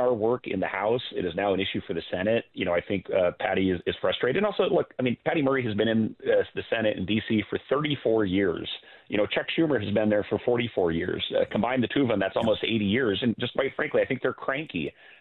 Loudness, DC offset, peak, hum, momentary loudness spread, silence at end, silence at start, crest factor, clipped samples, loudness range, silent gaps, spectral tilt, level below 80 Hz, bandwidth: -26 LUFS; under 0.1%; -10 dBFS; none; 5 LU; 0.3 s; 0 s; 16 dB; under 0.1%; 1 LU; none; -8.5 dB/octave; -60 dBFS; 4.3 kHz